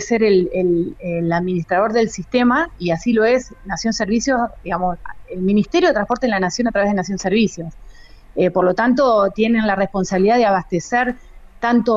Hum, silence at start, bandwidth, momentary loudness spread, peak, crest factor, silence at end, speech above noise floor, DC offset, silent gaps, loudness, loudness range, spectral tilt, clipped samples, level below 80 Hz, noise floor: none; 0 s; 7.8 kHz; 8 LU; -4 dBFS; 14 dB; 0 s; 23 dB; under 0.1%; none; -18 LUFS; 2 LU; -5.5 dB/octave; under 0.1%; -42 dBFS; -40 dBFS